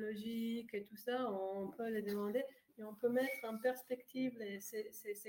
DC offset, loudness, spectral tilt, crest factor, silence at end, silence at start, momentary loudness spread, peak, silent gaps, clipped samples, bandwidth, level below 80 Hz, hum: under 0.1%; -42 LUFS; -5 dB/octave; 16 dB; 0 s; 0 s; 8 LU; -26 dBFS; none; under 0.1%; 17 kHz; -86 dBFS; none